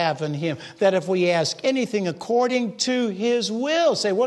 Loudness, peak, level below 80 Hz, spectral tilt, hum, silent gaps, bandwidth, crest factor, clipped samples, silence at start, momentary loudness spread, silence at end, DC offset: -22 LUFS; -6 dBFS; -72 dBFS; -4.5 dB/octave; none; none; 12 kHz; 16 dB; under 0.1%; 0 s; 6 LU; 0 s; under 0.1%